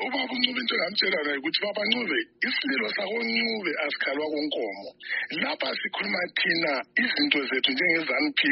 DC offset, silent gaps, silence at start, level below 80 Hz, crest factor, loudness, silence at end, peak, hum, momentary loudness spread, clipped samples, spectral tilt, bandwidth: under 0.1%; none; 0 s; -76 dBFS; 20 dB; -25 LUFS; 0 s; -6 dBFS; none; 6 LU; under 0.1%; 0 dB/octave; 5.8 kHz